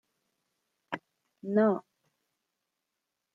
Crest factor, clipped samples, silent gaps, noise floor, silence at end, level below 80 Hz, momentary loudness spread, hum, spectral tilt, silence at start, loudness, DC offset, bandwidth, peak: 20 dB; under 0.1%; none; -85 dBFS; 1.55 s; -84 dBFS; 15 LU; none; -9 dB/octave; 0.9 s; -29 LUFS; under 0.1%; 5.8 kHz; -16 dBFS